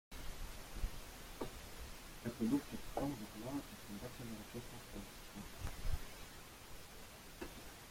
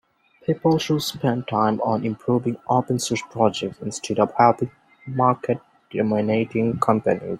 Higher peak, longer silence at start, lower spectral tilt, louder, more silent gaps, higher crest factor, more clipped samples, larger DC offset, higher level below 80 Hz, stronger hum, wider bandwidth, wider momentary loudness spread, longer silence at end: second, -26 dBFS vs -2 dBFS; second, 0.1 s vs 0.5 s; about the same, -5 dB/octave vs -6 dB/octave; second, -48 LUFS vs -22 LUFS; neither; about the same, 20 dB vs 20 dB; neither; neither; first, -52 dBFS vs -60 dBFS; neither; about the same, 16.5 kHz vs 15.5 kHz; first, 13 LU vs 10 LU; about the same, 0 s vs 0 s